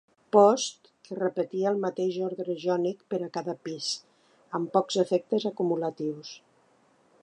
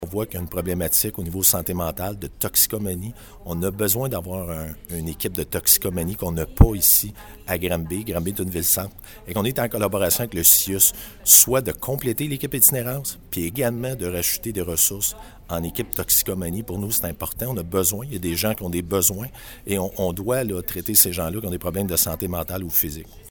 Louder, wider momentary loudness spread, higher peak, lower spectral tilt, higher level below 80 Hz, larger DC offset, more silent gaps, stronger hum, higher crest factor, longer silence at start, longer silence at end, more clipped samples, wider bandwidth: second, -28 LUFS vs -20 LUFS; about the same, 13 LU vs 14 LU; second, -6 dBFS vs 0 dBFS; first, -5 dB/octave vs -3.5 dB/octave; second, -84 dBFS vs -36 dBFS; neither; neither; neither; about the same, 22 dB vs 22 dB; first, 0.35 s vs 0 s; first, 0.85 s vs 0 s; neither; second, 10.5 kHz vs 19.5 kHz